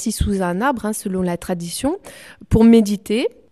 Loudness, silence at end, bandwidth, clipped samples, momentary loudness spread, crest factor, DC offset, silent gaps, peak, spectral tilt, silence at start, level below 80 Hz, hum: -18 LUFS; 0.25 s; 13.5 kHz; under 0.1%; 12 LU; 16 dB; 0.2%; none; -2 dBFS; -6 dB/octave; 0 s; -34 dBFS; none